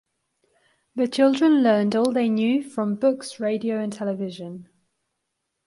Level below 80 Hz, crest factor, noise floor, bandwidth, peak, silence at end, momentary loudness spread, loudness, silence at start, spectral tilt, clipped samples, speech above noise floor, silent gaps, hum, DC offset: -72 dBFS; 16 dB; -79 dBFS; 11.5 kHz; -8 dBFS; 1.05 s; 14 LU; -22 LUFS; 0.95 s; -6 dB/octave; under 0.1%; 57 dB; none; none; under 0.1%